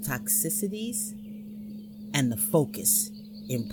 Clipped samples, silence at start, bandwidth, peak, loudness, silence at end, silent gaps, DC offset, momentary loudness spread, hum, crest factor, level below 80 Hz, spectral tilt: under 0.1%; 0 s; 19 kHz; -8 dBFS; -26 LUFS; 0 s; none; under 0.1%; 18 LU; none; 20 dB; -62 dBFS; -3.5 dB/octave